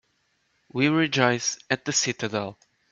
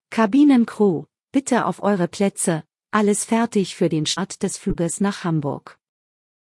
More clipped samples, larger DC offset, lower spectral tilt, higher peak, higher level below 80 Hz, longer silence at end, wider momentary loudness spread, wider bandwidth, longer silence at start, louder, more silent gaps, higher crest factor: neither; neither; second, -3.5 dB/octave vs -5 dB/octave; about the same, -2 dBFS vs -4 dBFS; second, -68 dBFS vs -48 dBFS; second, 0.4 s vs 1 s; about the same, 10 LU vs 9 LU; second, 8.4 kHz vs 12 kHz; first, 0.75 s vs 0.1 s; second, -24 LUFS vs -20 LUFS; second, none vs 1.23-1.27 s; first, 24 dB vs 16 dB